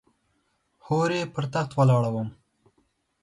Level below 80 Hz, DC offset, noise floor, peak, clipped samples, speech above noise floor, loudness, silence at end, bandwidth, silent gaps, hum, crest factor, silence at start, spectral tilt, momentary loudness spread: -62 dBFS; under 0.1%; -71 dBFS; -10 dBFS; under 0.1%; 48 dB; -25 LUFS; 0.9 s; 11.5 kHz; none; none; 18 dB; 0.9 s; -7 dB/octave; 9 LU